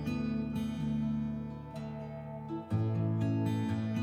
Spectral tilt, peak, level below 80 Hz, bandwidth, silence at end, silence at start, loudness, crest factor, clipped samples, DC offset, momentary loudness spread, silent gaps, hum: -8.5 dB/octave; -22 dBFS; -54 dBFS; 10 kHz; 0 s; 0 s; -35 LUFS; 12 dB; under 0.1%; under 0.1%; 10 LU; none; none